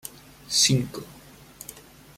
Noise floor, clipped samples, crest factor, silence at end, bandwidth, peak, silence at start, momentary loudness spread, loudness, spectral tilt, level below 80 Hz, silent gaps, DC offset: -49 dBFS; under 0.1%; 22 dB; 0.35 s; 16.5 kHz; -8 dBFS; 0.05 s; 22 LU; -22 LUFS; -3 dB/octave; -58 dBFS; none; under 0.1%